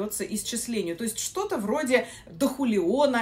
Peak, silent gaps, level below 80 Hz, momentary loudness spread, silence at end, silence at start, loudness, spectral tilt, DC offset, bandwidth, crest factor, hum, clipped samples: -8 dBFS; none; -58 dBFS; 6 LU; 0 s; 0 s; -27 LUFS; -3.5 dB/octave; under 0.1%; 16 kHz; 18 dB; none; under 0.1%